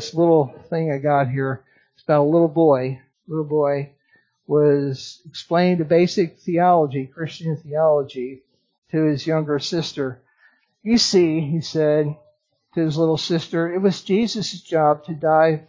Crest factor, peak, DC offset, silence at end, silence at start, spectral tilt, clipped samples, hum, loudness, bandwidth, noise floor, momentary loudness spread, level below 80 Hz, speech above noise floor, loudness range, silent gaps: 16 dB; -4 dBFS; under 0.1%; 0.05 s; 0 s; -6 dB/octave; under 0.1%; none; -20 LUFS; 7.6 kHz; -62 dBFS; 13 LU; -62 dBFS; 43 dB; 3 LU; 8.78-8.82 s